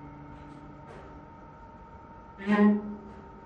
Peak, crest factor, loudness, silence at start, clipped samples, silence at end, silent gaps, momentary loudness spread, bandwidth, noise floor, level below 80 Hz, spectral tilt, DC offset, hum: -12 dBFS; 20 dB; -26 LUFS; 0 s; under 0.1%; 0.05 s; none; 25 LU; 5.2 kHz; -48 dBFS; -56 dBFS; -9 dB/octave; under 0.1%; none